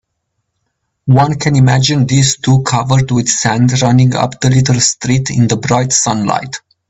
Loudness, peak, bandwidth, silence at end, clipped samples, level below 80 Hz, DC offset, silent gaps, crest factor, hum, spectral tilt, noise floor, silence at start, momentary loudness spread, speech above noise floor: -11 LUFS; 0 dBFS; 8.4 kHz; 0.3 s; under 0.1%; -42 dBFS; under 0.1%; none; 12 dB; none; -4.5 dB/octave; -69 dBFS; 1.05 s; 4 LU; 58 dB